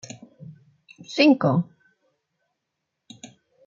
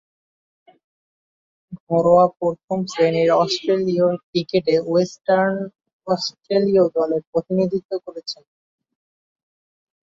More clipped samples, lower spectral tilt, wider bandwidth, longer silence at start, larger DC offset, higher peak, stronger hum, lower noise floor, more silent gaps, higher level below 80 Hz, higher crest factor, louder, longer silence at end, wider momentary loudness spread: neither; about the same, -6 dB/octave vs -6 dB/octave; about the same, 7.6 kHz vs 7.6 kHz; second, 0.5 s vs 1.7 s; neither; about the same, -4 dBFS vs -2 dBFS; neither; second, -81 dBFS vs under -90 dBFS; second, none vs 1.80-1.87 s, 2.64-2.68 s, 4.23-4.33 s, 5.93-5.99 s, 7.27-7.33 s, 7.85-7.89 s; second, -74 dBFS vs -62 dBFS; about the same, 22 dB vs 18 dB; about the same, -20 LUFS vs -20 LUFS; second, 0.4 s vs 1.75 s; first, 27 LU vs 13 LU